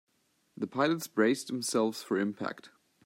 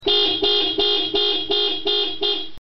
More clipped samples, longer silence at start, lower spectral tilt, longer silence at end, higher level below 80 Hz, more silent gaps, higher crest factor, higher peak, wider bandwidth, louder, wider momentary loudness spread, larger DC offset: neither; first, 0.6 s vs 0 s; first, -4.5 dB/octave vs 0.5 dB/octave; first, 0.4 s vs 0 s; second, -82 dBFS vs -48 dBFS; neither; first, 20 dB vs 12 dB; second, -12 dBFS vs -8 dBFS; first, 16 kHz vs 6.2 kHz; second, -31 LUFS vs -18 LUFS; first, 11 LU vs 4 LU; second, under 0.1% vs 2%